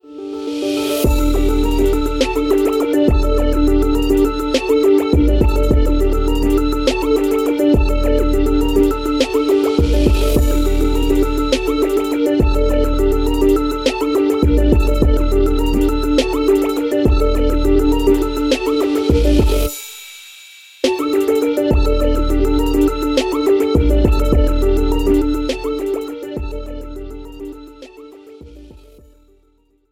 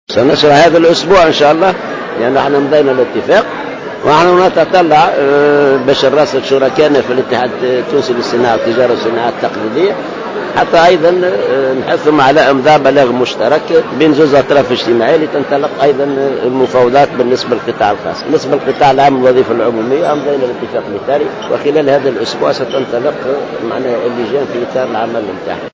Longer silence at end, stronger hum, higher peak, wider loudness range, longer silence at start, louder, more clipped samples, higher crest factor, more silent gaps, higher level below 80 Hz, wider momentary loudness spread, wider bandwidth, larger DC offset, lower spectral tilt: first, 1.25 s vs 0.05 s; neither; about the same, 0 dBFS vs 0 dBFS; about the same, 4 LU vs 5 LU; about the same, 0.05 s vs 0.1 s; second, -16 LUFS vs -10 LUFS; neither; about the same, 14 dB vs 10 dB; neither; first, -18 dBFS vs -46 dBFS; about the same, 8 LU vs 9 LU; first, 16.5 kHz vs 7.6 kHz; neither; about the same, -6.5 dB/octave vs -5.5 dB/octave